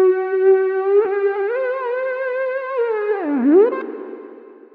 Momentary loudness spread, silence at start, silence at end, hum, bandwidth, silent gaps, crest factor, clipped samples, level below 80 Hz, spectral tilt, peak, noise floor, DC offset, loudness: 12 LU; 0 s; 0.2 s; none; 4.4 kHz; none; 14 dB; under 0.1%; -84 dBFS; -8 dB/octave; -4 dBFS; -40 dBFS; under 0.1%; -18 LUFS